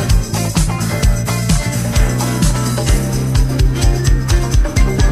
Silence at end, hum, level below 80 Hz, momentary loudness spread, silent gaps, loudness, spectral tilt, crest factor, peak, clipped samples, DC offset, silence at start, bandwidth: 0 s; none; -16 dBFS; 2 LU; none; -16 LUFS; -5 dB/octave; 12 dB; -2 dBFS; under 0.1%; under 0.1%; 0 s; 15 kHz